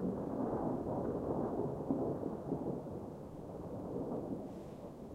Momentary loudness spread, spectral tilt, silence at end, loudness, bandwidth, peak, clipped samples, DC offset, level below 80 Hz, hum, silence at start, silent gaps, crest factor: 10 LU; -10 dB/octave; 0 s; -41 LUFS; 15.5 kHz; -20 dBFS; under 0.1%; under 0.1%; -60 dBFS; none; 0 s; none; 18 dB